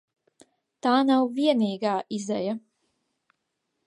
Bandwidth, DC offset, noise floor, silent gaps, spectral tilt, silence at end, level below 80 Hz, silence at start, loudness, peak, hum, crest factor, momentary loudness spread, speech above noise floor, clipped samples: 11 kHz; under 0.1%; -79 dBFS; none; -5.5 dB/octave; 1.3 s; -80 dBFS; 0.85 s; -25 LUFS; -10 dBFS; none; 18 dB; 9 LU; 55 dB; under 0.1%